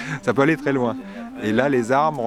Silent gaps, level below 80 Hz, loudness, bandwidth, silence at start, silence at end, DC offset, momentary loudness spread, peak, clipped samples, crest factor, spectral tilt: none; -54 dBFS; -20 LUFS; 13 kHz; 0 s; 0 s; under 0.1%; 10 LU; 0 dBFS; under 0.1%; 20 dB; -6.5 dB/octave